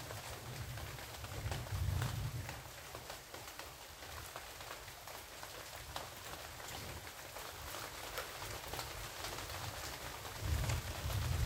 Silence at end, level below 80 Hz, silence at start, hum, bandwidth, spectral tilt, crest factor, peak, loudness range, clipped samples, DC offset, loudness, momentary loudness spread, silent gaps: 0 s; -52 dBFS; 0 s; none; 16 kHz; -3.5 dB/octave; 20 dB; -24 dBFS; 5 LU; under 0.1%; under 0.1%; -45 LUFS; 9 LU; none